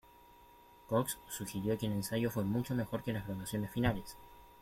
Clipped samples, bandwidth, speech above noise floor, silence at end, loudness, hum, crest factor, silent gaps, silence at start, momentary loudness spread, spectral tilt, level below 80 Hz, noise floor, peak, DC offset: under 0.1%; 16.5 kHz; 24 dB; 0 s; -37 LUFS; none; 18 dB; none; 0.3 s; 7 LU; -5.5 dB/octave; -58 dBFS; -60 dBFS; -18 dBFS; under 0.1%